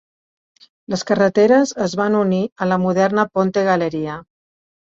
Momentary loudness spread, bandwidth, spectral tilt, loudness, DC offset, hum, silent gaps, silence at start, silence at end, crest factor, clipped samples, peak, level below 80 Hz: 12 LU; 7.8 kHz; -6 dB/octave; -17 LUFS; under 0.1%; none; 2.52-2.56 s; 0.9 s; 0.75 s; 16 dB; under 0.1%; -2 dBFS; -58 dBFS